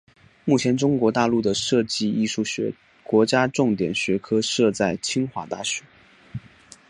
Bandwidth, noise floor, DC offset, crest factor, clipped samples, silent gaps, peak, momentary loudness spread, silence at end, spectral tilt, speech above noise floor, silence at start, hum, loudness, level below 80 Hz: 11.5 kHz; -50 dBFS; under 0.1%; 20 dB; under 0.1%; none; -4 dBFS; 11 LU; 0.5 s; -4.5 dB/octave; 28 dB; 0.45 s; none; -22 LUFS; -58 dBFS